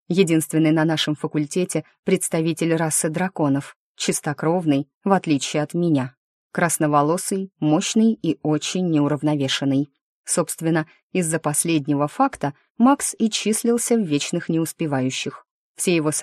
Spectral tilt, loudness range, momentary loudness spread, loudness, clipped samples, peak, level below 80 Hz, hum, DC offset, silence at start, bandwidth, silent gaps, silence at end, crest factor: -4.5 dB/octave; 2 LU; 7 LU; -21 LUFS; under 0.1%; -2 dBFS; -66 dBFS; none; under 0.1%; 0.1 s; 13 kHz; 1.99-2.03 s, 3.76-3.95 s, 4.94-5.01 s, 6.17-6.50 s, 10.01-10.24 s, 11.03-11.10 s, 12.70-12.75 s, 15.51-15.75 s; 0 s; 18 dB